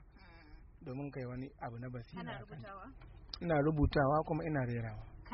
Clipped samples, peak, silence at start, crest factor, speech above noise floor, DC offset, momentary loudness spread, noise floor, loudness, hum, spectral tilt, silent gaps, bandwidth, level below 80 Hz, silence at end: under 0.1%; -18 dBFS; 0 s; 20 dB; 21 dB; under 0.1%; 20 LU; -58 dBFS; -37 LUFS; none; -6.5 dB/octave; none; 5.8 kHz; -50 dBFS; 0 s